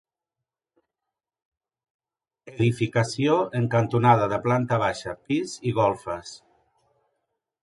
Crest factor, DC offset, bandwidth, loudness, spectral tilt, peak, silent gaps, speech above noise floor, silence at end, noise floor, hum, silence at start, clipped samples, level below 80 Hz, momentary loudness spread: 22 dB; under 0.1%; 11.5 kHz; -24 LUFS; -6.5 dB/octave; -4 dBFS; none; 65 dB; 1.25 s; -88 dBFS; none; 2.45 s; under 0.1%; -58 dBFS; 14 LU